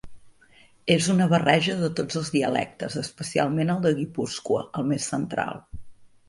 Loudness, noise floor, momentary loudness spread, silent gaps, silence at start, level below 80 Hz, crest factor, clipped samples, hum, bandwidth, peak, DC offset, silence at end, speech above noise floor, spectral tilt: -25 LUFS; -55 dBFS; 11 LU; none; 0.05 s; -56 dBFS; 20 dB; under 0.1%; none; 11.5 kHz; -4 dBFS; under 0.1%; 0.2 s; 31 dB; -5 dB/octave